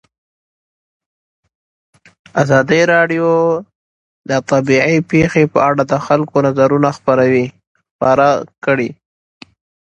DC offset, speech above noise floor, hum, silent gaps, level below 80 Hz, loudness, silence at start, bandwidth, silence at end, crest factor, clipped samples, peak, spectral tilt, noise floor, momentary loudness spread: under 0.1%; over 77 dB; none; 3.75-4.24 s, 7.67-7.75 s, 7.91-7.99 s; -50 dBFS; -14 LUFS; 2.35 s; 8.4 kHz; 1.05 s; 16 dB; under 0.1%; 0 dBFS; -6.5 dB/octave; under -90 dBFS; 7 LU